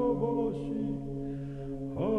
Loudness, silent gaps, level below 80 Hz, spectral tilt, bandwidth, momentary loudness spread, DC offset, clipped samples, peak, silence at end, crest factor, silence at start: -34 LUFS; none; -48 dBFS; -10 dB/octave; 6.2 kHz; 9 LU; under 0.1%; under 0.1%; -18 dBFS; 0 s; 14 dB; 0 s